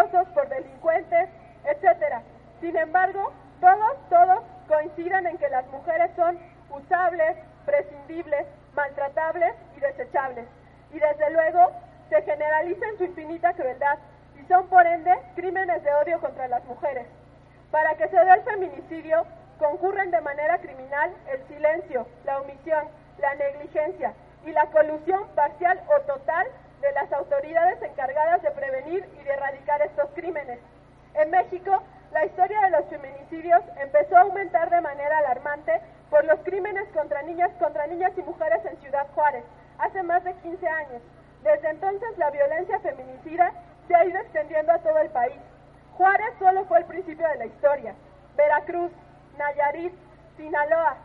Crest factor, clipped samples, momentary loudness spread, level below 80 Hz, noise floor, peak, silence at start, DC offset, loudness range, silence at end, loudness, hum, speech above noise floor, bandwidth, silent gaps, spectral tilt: 22 dB; under 0.1%; 12 LU; -58 dBFS; -51 dBFS; -2 dBFS; 0 s; under 0.1%; 5 LU; 0 s; -24 LUFS; none; 27 dB; 4.3 kHz; none; -8 dB/octave